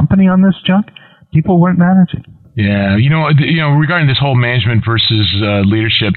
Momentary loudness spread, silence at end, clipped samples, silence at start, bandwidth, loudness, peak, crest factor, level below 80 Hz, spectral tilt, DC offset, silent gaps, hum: 6 LU; 0 s; under 0.1%; 0 s; 4.5 kHz; -11 LUFS; -2 dBFS; 10 dB; -40 dBFS; -10.5 dB/octave; under 0.1%; none; none